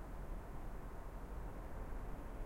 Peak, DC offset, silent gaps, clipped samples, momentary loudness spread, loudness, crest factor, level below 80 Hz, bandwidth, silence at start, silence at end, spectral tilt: -34 dBFS; under 0.1%; none; under 0.1%; 2 LU; -51 LUFS; 12 dB; -48 dBFS; 16.5 kHz; 0 s; 0 s; -7 dB/octave